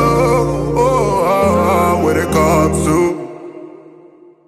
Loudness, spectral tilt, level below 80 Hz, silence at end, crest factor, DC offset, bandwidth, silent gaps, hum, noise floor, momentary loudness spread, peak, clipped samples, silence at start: -14 LUFS; -6 dB/octave; -32 dBFS; 0.75 s; 14 dB; under 0.1%; 16 kHz; none; none; -43 dBFS; 15 LU; -2 dBFS; under 0.1%; 0 s